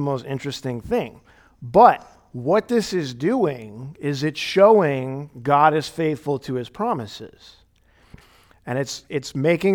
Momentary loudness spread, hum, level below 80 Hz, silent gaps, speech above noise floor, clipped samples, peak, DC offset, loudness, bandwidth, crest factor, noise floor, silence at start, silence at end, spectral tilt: 19 LU; none; -56 dBFS; none; 36 dB; under 0.1%; 0 dBFS; under 0.1%; -21 LUFS; 18 kHz; 22 dB; -57 dBFS; 0 s; 0 s; -6 dB/octave